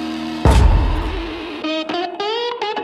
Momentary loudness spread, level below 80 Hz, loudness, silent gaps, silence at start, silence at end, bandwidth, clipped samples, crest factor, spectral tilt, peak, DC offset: 11 LU; -20 dBFS; -19 LUFS; none; 0 s; 0 s; 12.5 kHz; under 0.1%; 16 dB; -6 dB/octave; -2 dBFS; under 0.1%